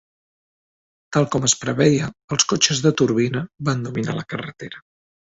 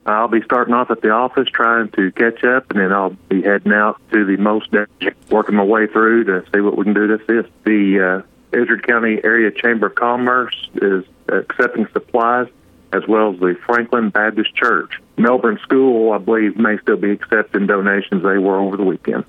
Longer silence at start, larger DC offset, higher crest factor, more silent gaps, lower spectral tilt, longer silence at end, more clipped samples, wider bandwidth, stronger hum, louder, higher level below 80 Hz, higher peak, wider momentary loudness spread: first, 1.1 s vs 0.05 s; neither; first, 20 dB vs 14 dB; first, 2.24-2.28 s vs none; second, -4 dB/octave vs -8 dB/octave; first, 0.6 s vs 0.05 s; neither; first, 8.2 kHz vs 5.4 kHz; neither; second, -20 LUFS vs -16 LUFS; first, -54 dBFS vs -62 dBFS; about the same, -2 dBFS vs -2 dBFS; first, 13 LU vs 5 LU